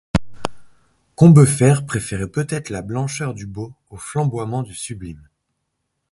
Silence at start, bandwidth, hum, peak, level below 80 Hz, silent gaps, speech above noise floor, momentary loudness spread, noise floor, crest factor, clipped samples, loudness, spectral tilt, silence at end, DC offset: 0.15 s; 11.5 kHz; none; 0 dBFS; -42 dBFS; none; 57 dB; 21 LU; -74 dBFS; 18 dB; under 0.1%; -18 LUFS; -6.5 dB/octave; 0.95 s; under 0.1%